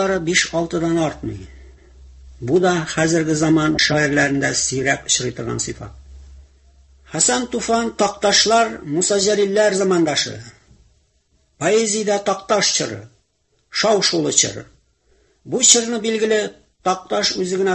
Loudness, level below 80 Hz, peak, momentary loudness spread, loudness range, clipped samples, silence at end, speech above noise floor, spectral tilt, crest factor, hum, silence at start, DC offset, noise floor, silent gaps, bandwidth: -17 LUFS; -46 dBFS; 0 dBFS; 12 LU; 4 LU; under 0.1%; 0 s; 47 dB; -3 dB/octave; 20 dB; none; 0 s; under 0.1%; -65 dBFS; none; 16 kHz